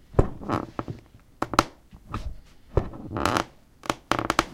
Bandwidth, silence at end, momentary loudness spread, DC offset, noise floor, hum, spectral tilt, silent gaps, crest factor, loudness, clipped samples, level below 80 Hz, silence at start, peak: 16.5 kHz; 0 s; 14 LU; under 0.1%; -49 dBFS; none; -5 dB/octave; none; 28 dB; -29 LUFS; under 0.1%; -38 dBFS; 0.1 s; 0 dBFS